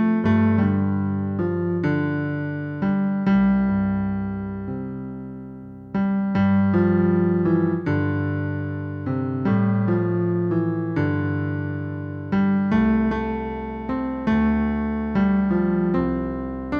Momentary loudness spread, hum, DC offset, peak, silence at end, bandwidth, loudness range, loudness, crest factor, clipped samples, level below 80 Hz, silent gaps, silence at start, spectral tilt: 11 LU; none; under 0.1%; -8 dBFS; 0 s; 5.2 kHz; 2 LU; -22 LUFS; 14 dB; under 0.1%; -42 dBFS; none; 0 s; -10.5 dB/octave